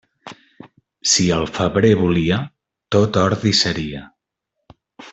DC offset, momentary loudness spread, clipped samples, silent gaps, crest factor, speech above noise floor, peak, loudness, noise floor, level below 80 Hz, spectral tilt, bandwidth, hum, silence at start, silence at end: under 0.1%; 10 LU; under 0.1%; none; 18 dB; 61 dB; -2 dBFS; -17 LUFS; -78 dBFS; -46 dBFS; -4.5 dB/octave; 8.4 kHz; none; 0.25 s; 0 s